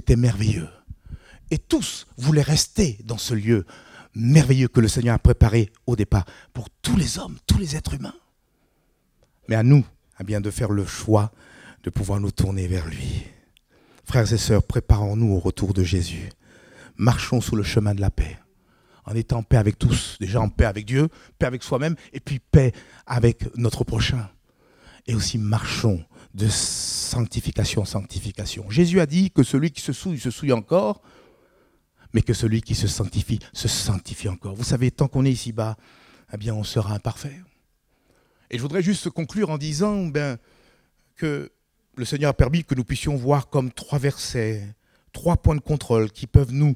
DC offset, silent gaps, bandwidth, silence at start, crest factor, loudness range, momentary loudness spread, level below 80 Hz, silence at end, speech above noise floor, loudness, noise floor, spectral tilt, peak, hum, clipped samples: under 0.1%; none; 15.5 kHz; 0.05 s; 22 dB; 6 LU; 13 LU; -34 dBFS; 0 s; 45 dB; -23 LUFS; -66 dBFS; -6 dB/octave; 0 dBFS; none; under 0.1%